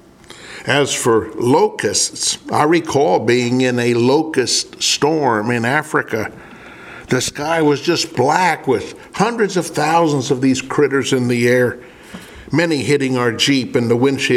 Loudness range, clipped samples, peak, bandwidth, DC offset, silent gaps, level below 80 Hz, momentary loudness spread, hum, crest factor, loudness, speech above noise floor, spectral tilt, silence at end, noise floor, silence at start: 3 LU; under 0.1%; 0 dBFS; 15.5 kHz; under 0.1%; none; -54 dBFS; 8 LU; none; 16 dB; -16 LUFS; 23 dB; -4 dB/octave; 0 s; -39 dBFS; 0.3 s